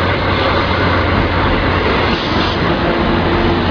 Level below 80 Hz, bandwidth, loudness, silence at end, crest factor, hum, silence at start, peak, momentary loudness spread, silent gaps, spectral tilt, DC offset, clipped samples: -24 dBFS; 5.4 kHz; -14 LUFS; 0 s; 12 dB; none; 0 s; -2 dBFS; 1 LU; none; -7 dB/octave; under 0.1%; under 0.1%